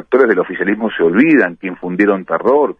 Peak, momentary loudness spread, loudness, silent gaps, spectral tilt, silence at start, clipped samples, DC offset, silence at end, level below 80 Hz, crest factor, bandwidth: 0 dBFS; 8 LU; -14 LUFS; none; -8.5 dB/octave; 0.1 s; under 0.1%; under 0.1%; 0.05 s; -58 dBFS; 12 dB; 5 kHz